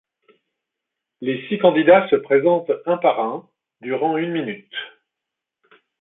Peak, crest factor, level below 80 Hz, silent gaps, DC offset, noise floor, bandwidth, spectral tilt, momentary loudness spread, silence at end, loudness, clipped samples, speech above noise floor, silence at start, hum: -2 dBFS; 20 dB; -68 dBFS; none; under 0.1%; -84 dBFS; 4 kHz; -10.5 dB/octave; 18 LU; 1.15 s; -19 LUFS; under 0.1%; 65 dB; 1.2 s; none